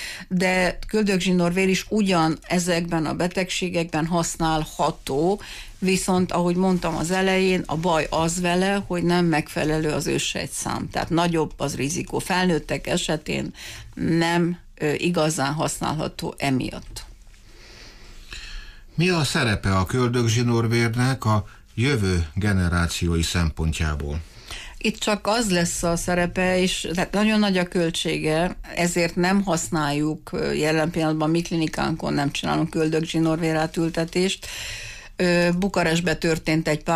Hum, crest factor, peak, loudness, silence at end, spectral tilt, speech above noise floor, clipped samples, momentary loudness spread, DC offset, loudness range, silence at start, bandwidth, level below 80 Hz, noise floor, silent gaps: none; 12 dB; -10 dBFS; -23 LUFS; 0 s; -5 dB/octave; 23 dB; under 0.1%; 7 LU; under 0.1%; 3 LU; 0 s; 15.5 kHz; -40 dBFS; -46 dBFS; none